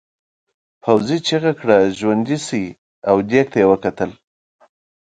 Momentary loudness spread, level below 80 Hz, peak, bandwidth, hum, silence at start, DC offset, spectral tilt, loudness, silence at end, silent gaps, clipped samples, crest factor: 11 LU; -54 dBFS; 0 dBFS; 9.2 kHz; none; 0.85 s; under 0.1%; -5.5 dB/octave; -17 LUFS; 0.95 s; 2.78-3.02 s; under 0.1%; 18 dB